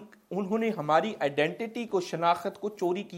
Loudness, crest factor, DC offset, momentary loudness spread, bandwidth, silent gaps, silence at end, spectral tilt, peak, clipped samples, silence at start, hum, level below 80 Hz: -29 LUFS; 18 dB; under 0.1%; 9 LU; 16.5 kHz; none; 0 s; -5.5 dB/octave; -10 dBFS; under 0.1%; 0 s; none; -78 dBFS